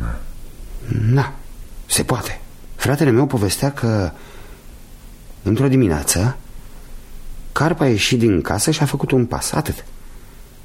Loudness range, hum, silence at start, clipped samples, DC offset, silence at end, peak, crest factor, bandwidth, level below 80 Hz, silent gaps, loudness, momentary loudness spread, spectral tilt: 3 LU; none; 0 s; under 0.1%; under 0.1%; 0 s; -2 dBFS; 18 dB; 16.5 kHz; -34 dBFS; none; -18 LUFS; 20 LU; -5 dB/octave